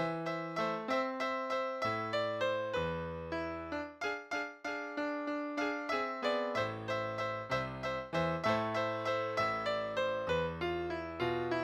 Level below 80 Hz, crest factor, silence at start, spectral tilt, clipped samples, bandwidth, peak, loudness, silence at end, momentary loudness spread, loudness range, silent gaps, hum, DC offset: -62 dBFS; 16 dB; 0 s; -5.5 dB/octave; under 0.1%; 14 kHz; -20 dBFS; -36 LUFS; 0 s; 6 LU; 3 LU; none; none; under 0.1%